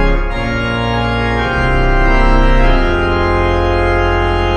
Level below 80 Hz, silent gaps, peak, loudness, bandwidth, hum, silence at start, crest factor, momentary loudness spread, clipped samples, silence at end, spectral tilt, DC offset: -14 dBFS; none; 0 dBFS; -14 LUFS; 7 kHz; none; 0 s; 12 dB; 4 LU; under 0.1%; 0 s; -7 dB/octave; under 0.1%